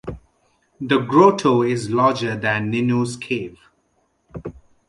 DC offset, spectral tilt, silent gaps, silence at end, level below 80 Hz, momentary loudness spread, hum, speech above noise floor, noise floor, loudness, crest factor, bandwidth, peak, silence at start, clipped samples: under 0.1%; -6 dB/octave; none; 0.3 s; -52 dBFS; 21 LU; none; 47 dB; -66 dBFS; -19 LUFS; 20 dB; 11.5 kHz; -2 dBFS; 0.05 s; under 0.1%